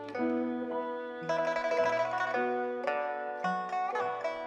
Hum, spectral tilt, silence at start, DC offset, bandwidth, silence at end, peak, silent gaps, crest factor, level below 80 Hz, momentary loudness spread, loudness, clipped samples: none; -5.5 dB/octave; 0 s; under 0.1%; 9.6 kHz; 0 s; -18 dBFS; none; 14 dB; -76 dBFS; 6 LU; -32 LUFS; under 0.1%